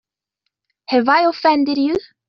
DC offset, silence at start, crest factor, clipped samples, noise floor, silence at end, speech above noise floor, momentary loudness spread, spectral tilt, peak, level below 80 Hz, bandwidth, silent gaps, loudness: under 0.1%; 0.9 s; 18 dB; under 0.1%; -77 dBFS; 0.25 s; 61 dB; 6 LU; -1.5 dB/octave; -2 dBFS; -58 dBFS; 6.6 kHz; none; -16 LUFS